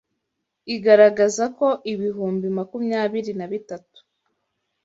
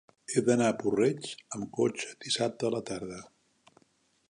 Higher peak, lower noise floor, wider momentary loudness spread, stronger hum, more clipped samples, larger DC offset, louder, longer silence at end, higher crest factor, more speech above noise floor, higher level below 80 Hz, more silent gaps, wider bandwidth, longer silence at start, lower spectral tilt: first, -2 dBFS vs -10 dBFS; first, -78 dBFS vs -70 dBFS; first, 17 LU vs 12 LU; neither; neither; neither; first, -20 LUFS vs -30 LUFS; about the same, 1.05 s vs 1.05 s; about the same, 20 dB vs 20 dB; first, 58 dB vs 40 dB; about the same, -70 dBFS vs -70 dBFS; neither; second, 8 kHz vs 11 kHz; first, 0.65 s vs 0.3 s; about the same, -5 dB/octave vs -4.5 dB/octave